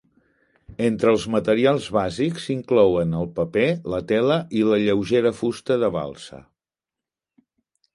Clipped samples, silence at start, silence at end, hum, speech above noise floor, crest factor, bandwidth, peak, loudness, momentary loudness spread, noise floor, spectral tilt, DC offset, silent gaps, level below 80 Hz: under 0.1%; 0.7 s; 1.6 s; none; 68 dB; 18 dB; 11.5 kHz; -4 dBFS; -21 LUFS; 8 LU; -89 dBFS; -6.5 dB/octave; under 0.1%; none; -52 dBFS